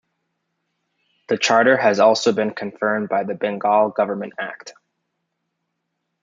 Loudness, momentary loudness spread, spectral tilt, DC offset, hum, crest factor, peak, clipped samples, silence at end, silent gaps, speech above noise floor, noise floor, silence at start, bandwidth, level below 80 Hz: -19 LUFS; 13 LU; -4 dB/octave; under 0.1%; none; 20 dB; -2 dBFS; under 0.1%; 1.5 s; none; 58 dB; -76 dBFS; 1.3 s; 9.4 kHz; -72 dBFS